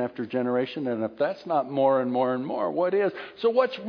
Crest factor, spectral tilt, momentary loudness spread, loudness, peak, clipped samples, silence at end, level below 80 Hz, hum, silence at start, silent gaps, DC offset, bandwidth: 16 dB; -8 dB/octave; 6 LU; -26 LUFS; -10 dBFS; under 0.1%; 0 s; -74 dBFS; none; 0 s; none; under 0.1%; 5.4 kHz